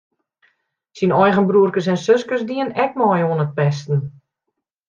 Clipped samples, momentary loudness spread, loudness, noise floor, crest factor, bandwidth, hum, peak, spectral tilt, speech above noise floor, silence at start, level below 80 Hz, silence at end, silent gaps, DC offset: under 0.1%; 8 LU; -18 LUFS; -78 dBFS; 16 dB; 7.4 kHz; none; -2 dBFS; -7.5 dB/octave; 61 dB; 0.95 s; -62 dBFS; 0.8 s; none; under 0.1%